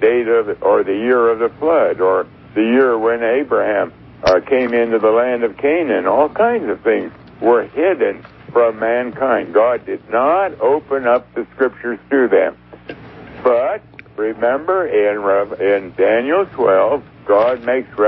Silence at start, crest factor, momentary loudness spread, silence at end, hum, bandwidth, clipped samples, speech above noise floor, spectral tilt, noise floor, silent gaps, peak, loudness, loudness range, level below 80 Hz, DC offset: 0 s; 14 dB; 8 LU; 0 s; 60 Hz at -50 dBFS; 6 kHz; under 0.1%; 20 dB; -7 dB/octave; -35 dBFS; none; 0 dBFS; -16 LUFS; 3 LU; -52 dBFS; under 0.1%